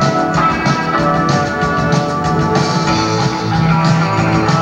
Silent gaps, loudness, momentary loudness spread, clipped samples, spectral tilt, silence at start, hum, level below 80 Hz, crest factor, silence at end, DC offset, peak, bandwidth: none; -14 LUFS; 3 LU; under 0.1%; -6 dB/octave; 0 s; none; -34 dBFS; 12 dB; 0 s; under 0.1%; -2 dBFS; 9 kHz